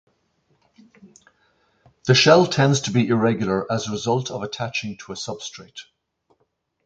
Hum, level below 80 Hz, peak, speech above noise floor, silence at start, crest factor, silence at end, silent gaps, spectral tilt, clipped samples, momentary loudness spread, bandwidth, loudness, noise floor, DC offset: none; -58 dBFS; 0 dBFS; 50 dB; 2.05 s; 22 dB; 1.05 s; none; -5 dB/octave; under 0.1%; 19 LU; 9 kHz; -20 LUFS; -70 dBFS; under 0.1%